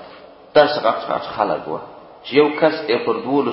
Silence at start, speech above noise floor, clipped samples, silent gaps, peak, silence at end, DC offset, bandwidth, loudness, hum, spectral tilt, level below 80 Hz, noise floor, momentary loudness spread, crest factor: 0 s; 23 dB; under 0.1%; none; 0 dBFS; 0 s; under 0.1%; 5.8 kHz; -18 LUFS; none; -9.5 dB/octave; -60 dBFS; -42 dBFS; 15 LU; 18 dB